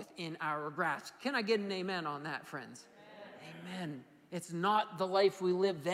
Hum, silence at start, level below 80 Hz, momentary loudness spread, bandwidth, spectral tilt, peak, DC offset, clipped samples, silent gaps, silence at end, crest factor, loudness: none; 0 s; -86 dBFS; 20 LU; 15.5 kHz; -5 dB/octave; -18 dBFS; under 0.1%; under 0.1%; none; 0 s; 18 dB; -36 LUFS